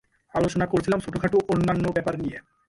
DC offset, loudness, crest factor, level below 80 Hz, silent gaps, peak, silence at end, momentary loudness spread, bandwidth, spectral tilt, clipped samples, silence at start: under 0.1%; -25 LUFS; 14 dB; -48 dBFS; none; -10 dBFS; 0.3 s; 8 LU; 11.5 kHz; -7 dB/octave; under 0.1%; 0.35 s